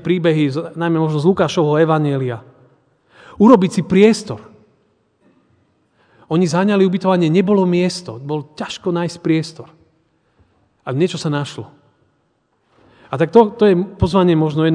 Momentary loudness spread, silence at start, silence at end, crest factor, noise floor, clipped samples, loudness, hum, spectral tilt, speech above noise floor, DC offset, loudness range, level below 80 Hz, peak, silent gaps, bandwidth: 13 LU; 0 s; 0 s; 16 dB; -64 dBFS; under 0.1%; -16 LUFS; none; -7 dB/octave; 49 dB; under 0.1%; 8 LU; -46 dBFS; 0 dBFS; none; 10 kHz